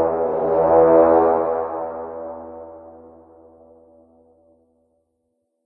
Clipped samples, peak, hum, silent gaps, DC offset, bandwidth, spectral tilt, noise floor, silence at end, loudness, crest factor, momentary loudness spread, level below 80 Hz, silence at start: under 0.1%; -2 dBFS; none; none; under 0.1%; 2.8 kHz; -11.5 dB/octave; -72 dBFS; 2.75 s; -17 LUFS; 18 dB; 23 LU; -52 dBFS; 0 s